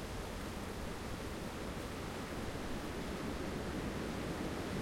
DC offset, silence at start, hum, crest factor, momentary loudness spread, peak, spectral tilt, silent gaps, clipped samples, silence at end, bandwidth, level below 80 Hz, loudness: under 0.1%; 0 s; none; 14 dB; 3 LU; -28 dBFS; -5 dB/octave; none; under 0.1%; 0 s; 16.5 kHz; -50 dBFS; -42 LUFS